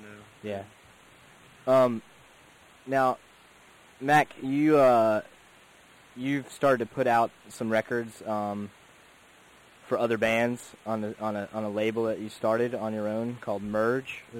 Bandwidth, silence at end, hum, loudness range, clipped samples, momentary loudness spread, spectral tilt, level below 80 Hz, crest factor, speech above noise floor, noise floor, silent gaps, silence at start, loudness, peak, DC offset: 16.5 kHz; 0 s; none; 5 LU; under 0.1%; 14 LU; -6 dB/octave; -66 dBFS; 16 dB; 29 dB; -56 dBFS; none; 0 s; -27 LUFS; -12 dBFS; under 0.1%